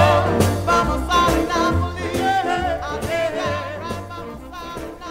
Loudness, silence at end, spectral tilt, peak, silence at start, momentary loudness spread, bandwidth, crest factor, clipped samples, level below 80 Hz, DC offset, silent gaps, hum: -20 LUFS; 0 s; -5.5 dB/octave; -4 dBFS; 0 s; 15 LU; 16 kHz; 18 dB; under 0.1%; -34 dBFS; under 0.1%; none; none